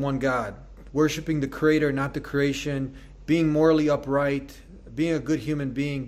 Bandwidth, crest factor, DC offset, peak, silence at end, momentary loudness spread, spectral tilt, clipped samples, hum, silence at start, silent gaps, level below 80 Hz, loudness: 14.5 kHz; 18 dB; under 0.1%; -8 dBFS; 0 s; 12 LU; -6.5 dB/octave; under 0.1%; none; 0 s; none; -46 dBFS; -25 LUFS